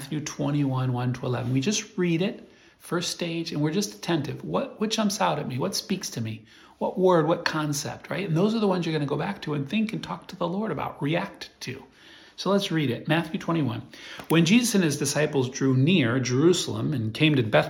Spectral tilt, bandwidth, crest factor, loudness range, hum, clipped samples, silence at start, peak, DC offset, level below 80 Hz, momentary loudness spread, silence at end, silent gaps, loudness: -5 dB/octave; 17.5 kHz; 18 dB; 6 LU; none; under 0.1%; 0 s; -6 dBFS; under 0.1%; -62 dBFS; 11 LU; 0 s; none; -25 LUFS